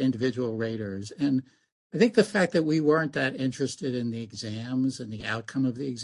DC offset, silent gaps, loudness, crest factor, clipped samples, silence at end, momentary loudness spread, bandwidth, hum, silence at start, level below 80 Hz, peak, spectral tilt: under 0.1%; 1.72-1.90 s; -27 LUFS; 22 dB; under 0.1%; 0 s; 11 LU; 11.5 kHz; none; 0 s; -64 dBFS; -6 dBFS; -6 dB/octave